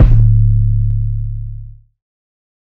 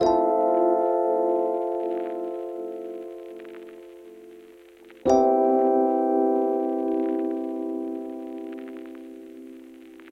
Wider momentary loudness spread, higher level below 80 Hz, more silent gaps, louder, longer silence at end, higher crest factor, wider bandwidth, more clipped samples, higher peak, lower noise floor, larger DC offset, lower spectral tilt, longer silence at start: second, 18 LU vs 22 LU; first, -16 dBFS vs -62 dBFS; neither; first, -14 LUFS vs -24 LUFS; first, 1 s vs 0 s; second, 12 dB vs 18 dB; second, 2.7 kHz vs 8 kHz; first, 0.7% vs under 0.1%; first, 0 dBFS vs -6 dBFS; second, -31 dBFS vs -49 dBFS; neither; first, -11.5 dB/octave vs -6.5 dB/octave; about the same, 0 s vs 0 s